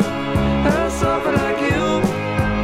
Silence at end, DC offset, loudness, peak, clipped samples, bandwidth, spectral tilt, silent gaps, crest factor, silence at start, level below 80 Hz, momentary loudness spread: 0 s; under 0.1%; -19 LUFS; -4 dBFS; under 0.1%; 15.5 kHz; -6 dB/octave; none; 14 dB; 0 s; -30 dBFS; 2 LU